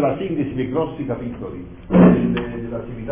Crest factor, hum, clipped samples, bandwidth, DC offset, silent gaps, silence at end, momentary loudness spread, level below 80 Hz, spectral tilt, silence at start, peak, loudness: 18 dB; none; under 0.1%; 3.6 kHz; under 0.1%; none; 0 s; 17 LU; -40 dBFS; -12.5 dB/octave; 0 s; -2 dBFS; -19 LUFS